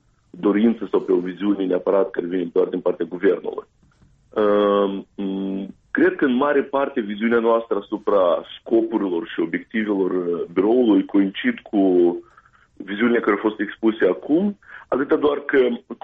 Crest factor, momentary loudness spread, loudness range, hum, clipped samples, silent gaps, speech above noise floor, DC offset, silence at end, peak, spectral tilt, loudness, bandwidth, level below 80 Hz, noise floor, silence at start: 14 dB; 9 LU; 2 LU; none; under 0.1%; none; 36 dB; under 0.1%; 0.1 s; -6 dBFS; -9 dB/octave; -21 LUFS; 4.5 kHz; -60 dBFS; -56 dBFS; 0.35 s